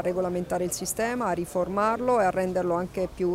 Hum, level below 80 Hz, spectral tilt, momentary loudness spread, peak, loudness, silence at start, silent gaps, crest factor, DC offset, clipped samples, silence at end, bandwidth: none; -52 dBFS; -5 dB/octave; 5 LU; -12 dBFS; -27 LUFS; 0 s; none; 14 dB; under 0.1%; under 0.1%; 0 s; 16 kHz